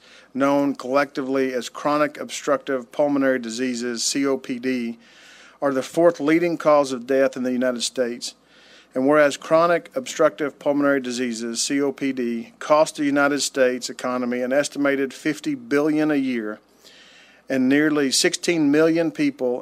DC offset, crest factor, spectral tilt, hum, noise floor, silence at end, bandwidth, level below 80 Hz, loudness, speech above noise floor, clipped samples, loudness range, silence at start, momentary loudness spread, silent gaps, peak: under 0.1%; 18 dB; -3.5 dB/octave; none; -51 dBFS; 0 s; 15.5 kHz; -72 dBFS; -21 LUFS; 30 dB; under 0.1%; 2 LU; 0.35 s; 9 LU; none; -4 dBFS